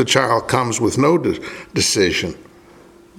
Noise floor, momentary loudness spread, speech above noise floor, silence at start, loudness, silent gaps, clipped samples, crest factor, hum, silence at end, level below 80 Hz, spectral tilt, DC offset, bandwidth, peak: -45 dBFS; 10 LU; 28 dB; 0 s; -17 LUFS; none; under 0.1%; 18 dB; none; 0.75 s; -48 dBFS; -3.5 dB/octave; under 0.1%; 16.5 kHz; 0 dBFS